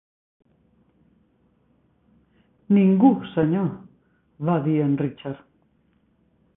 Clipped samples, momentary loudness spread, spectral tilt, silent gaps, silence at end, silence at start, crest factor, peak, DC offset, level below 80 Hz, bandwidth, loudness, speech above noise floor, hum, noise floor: under 0.1%; 18 LU; -13 dB/octave; none; 1.2 s; 2.7 s; 20 dB; -4 dBFS; under 0.1%; -62 dBFS; 3.8 kHz; -21 LUFS; 44 dB; none; -64 dBFS